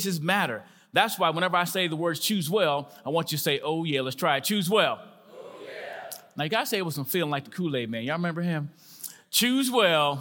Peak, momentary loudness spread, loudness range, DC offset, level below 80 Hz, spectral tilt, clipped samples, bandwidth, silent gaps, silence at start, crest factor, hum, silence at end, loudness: -6 dBFS; 16 LU; 4 LU; under 0.1%; -80 dBFS; -4 dB/octave; under 0.1%; 17 kHz; none; 0 s; 22 dB; none; 0 s; -26 LUFS